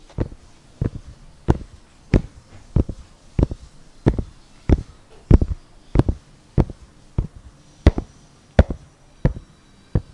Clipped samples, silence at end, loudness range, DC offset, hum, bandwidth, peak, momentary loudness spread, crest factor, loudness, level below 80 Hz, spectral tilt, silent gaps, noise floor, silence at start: under 0.1%; 0.1 s; 3 LU; under 0.1%; none; 10.5 kHz; 0 dBFS; 19 LU; 22 dB; -23 LUFS; -26 dBFS; -8.5 dB/octave; none; -50 dBFS; 0.2 s